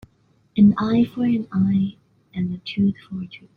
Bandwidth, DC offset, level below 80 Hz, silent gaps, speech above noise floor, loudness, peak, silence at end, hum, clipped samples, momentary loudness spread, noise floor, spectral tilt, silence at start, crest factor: 4.9 kHz; under 0.1%; -54 dBFS; none; 41 dB; -21 LUFS; -6 dBFS; 0.2 s; none; under 0.1%; 16 LU; -61 dBFS; -9.5 dB/octave; 0.55 s; 16 dB